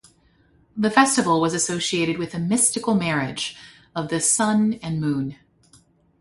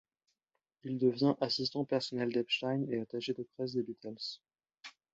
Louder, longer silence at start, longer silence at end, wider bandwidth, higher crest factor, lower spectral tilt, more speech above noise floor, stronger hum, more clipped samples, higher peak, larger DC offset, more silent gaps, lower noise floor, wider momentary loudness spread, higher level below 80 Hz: first, -21 LUFS vs -35 LUFS; about the same, 0.75 s vs 0.85 s; first, 0.85 s vs 0.25 s; first, 12 kHz vs 8 kHz; about the same, 20 dB vs 18 dB; second, -3.5 dB/octave vs -6 dB/octave; second, 37 dB vs 53 dB; neither; neither; first, -2 dBFS vs -18 dBFS; neither; neither; second, -59 dBFS vs -87 dBFS; second, 12 LU vs 18 LU; first, -58 dBFS vs -76 dBFS